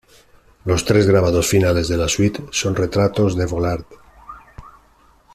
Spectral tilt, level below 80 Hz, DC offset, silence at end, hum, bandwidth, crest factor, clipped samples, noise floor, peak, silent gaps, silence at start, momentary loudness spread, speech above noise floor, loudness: -5 dB/octave; -40 dBFS; under 0.1%; 0.65 s; none; 14 kHz; 16 dB; under 0.1%; -53 dBFS; -2 dBFS; none; 0.65 s; 11 LU; 36 dB; -18 LUFS